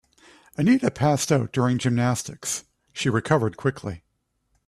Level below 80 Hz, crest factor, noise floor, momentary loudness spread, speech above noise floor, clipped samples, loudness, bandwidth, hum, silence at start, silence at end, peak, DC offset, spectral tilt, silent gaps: -56 dBFS; 20 dB; -73 dBFS; 15 LU; 50 dB; under 0.1%; -23 LUFS; 14 kHz; none; 0.6 s; 0.7 s; -4 dBFS; under 0.1%; -5.5 dB/octave; none